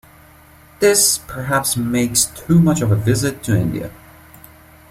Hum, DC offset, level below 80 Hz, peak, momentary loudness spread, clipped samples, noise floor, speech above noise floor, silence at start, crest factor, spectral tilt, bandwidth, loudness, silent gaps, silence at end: none; under 0.1%; -44 dBFS; -2 dBFS; 8 LU; under 0.1%; -46 dBFS; 29 dB; 0.8 s; 18 dB; -4.5 dB/octave; 16 kHz; -16 LUFS; none; 0.95 s